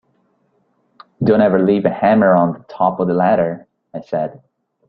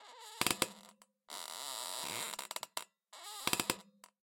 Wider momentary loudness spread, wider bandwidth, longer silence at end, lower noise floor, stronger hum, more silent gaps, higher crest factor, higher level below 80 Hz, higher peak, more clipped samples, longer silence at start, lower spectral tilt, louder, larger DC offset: second, 13 LU vs 16 LU; second, 5.4 kHz vs 17 kHz; about the same, 0.5 s vs 0.4 s; about the same, -62 dBFS vs -63 dBFS; neither; neither; second, 16 dB vs 32 dB; first, -54 dBFS vs -76 dBFS; first, -2 dBFS vs -10 dBFS; neither; first, 1.2 s vs 0 s; first, -10.5 dB/octave vs -1 dB/octave; first, -16 LUFS vs -39 LUFS; neither